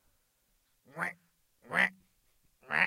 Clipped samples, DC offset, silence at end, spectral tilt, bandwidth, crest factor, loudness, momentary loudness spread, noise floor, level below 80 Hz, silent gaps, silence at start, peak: under 0.1%; under 0.1%; 0 s; -3.5 dB/octave; 16 kHz; 24 dB; -33 LUFS; 9 LU; -74 dBFS; -76 dBFS; none; 0.95 s; -12 dBFS